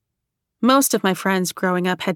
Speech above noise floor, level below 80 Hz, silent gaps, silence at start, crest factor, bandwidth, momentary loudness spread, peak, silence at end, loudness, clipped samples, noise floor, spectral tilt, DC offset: 61 dB; -66 dBFS; none; 0.6 s; 18 dB; 19 kHz; 5 LU; -2 dBFS; 0 s; -19 LUFS; under 0.1%; -80 dBFS; -4 dB/octave; under 0.1%